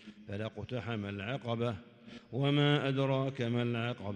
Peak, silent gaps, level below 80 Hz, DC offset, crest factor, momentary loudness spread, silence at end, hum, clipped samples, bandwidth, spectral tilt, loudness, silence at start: -18 dBFS; none; -70 dBFS; under 0.1%; 18 dB; 14 LU; 0 s; none; under 0.1%; 8.8 kHz; -7.5 dB/octave; -34 LUFS; 0 s